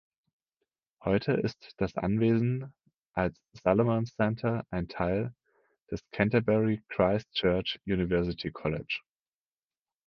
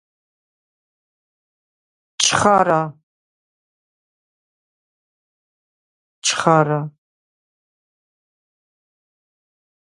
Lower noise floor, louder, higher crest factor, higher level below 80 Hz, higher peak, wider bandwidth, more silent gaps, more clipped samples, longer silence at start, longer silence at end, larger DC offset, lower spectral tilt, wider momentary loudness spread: about the same, under -90 dBFS vs under -90 dBFS; second, -30 LUFS vs -17 LUFS; about the same, 22 dB vs 24 dB; first, -52 dBFS vs -60 dBFS; second, -8 dBFS vs 0 dBFS; second, 6.8 kHz vs 11.5 kHz; second, 2.97-3.03 s, 3.10-3.14 s, 5.82-5.86 s vs 3.03-6.22 s; neither; second, 1 s vs 2.2 s; second, 1.05 s vs 3.1 s; neither; first, -8 dB/octave vs -3.5 dB/octave; about the same, 10 LU vs 11 LU